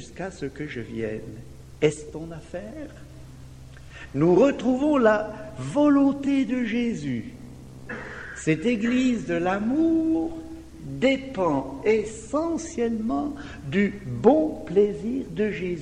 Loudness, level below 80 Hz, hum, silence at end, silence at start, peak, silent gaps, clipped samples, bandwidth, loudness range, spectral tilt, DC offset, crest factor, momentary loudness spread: -24 LUFS; -48 dBFS; none; 0 s; 0 s; -4 dBFS; none; under 0.1%; 10.5 kHz; 8 LU; -6.5 dB/octave; under 0.1%; 20 dB; 21 LU